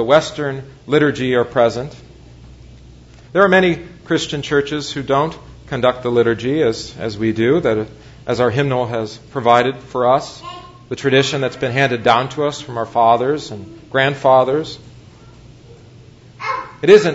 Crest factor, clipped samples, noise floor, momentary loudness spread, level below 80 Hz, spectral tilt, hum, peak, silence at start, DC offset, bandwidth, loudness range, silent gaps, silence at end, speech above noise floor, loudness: 18 dB; under 0.1%; -42 dBFS; 14 LU; -48 dBFS; -5.5 dB/octave; none; 0 dBFS; 0 s; under 0.1%; 8 kHz; 2 LU; none; 0 s; 26 dB; -17 LUFS